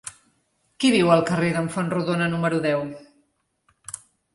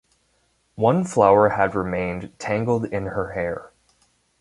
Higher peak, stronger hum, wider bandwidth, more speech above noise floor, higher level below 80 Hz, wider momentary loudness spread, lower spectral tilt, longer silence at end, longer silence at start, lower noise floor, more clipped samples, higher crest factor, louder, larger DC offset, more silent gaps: about the same, -4 dBFS vs -2 dBFS; neither; about the same, 11.5 kHz vs 11.5 kHz; about the same, 47 dB vs 45 dB; second, -62 dBFS vs -48 dBFS; first, 20 LU vs 13 LU; second, -5.5 dB/octave vs -7 dB/octave; second, 0.4 s vs 0.75 s; second, 0.05 s vs 0.75 s; about the same, -68 dBFS vs -66 dBFS; neither; about the same, 20 dB vs 20 dB; about the same, -22 LUFS vs -21 LUFS; neither; neither